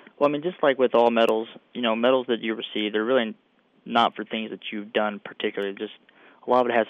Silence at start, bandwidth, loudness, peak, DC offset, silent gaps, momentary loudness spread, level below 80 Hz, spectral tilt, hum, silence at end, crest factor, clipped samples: 0.2 s; 12.5 kHz; -24 LUFS; -8 dBFS; under 0.1%; none; 12 LU; -76 dBFS; -6 dB/octave; none; 0 s; 18 dB; under 0.1%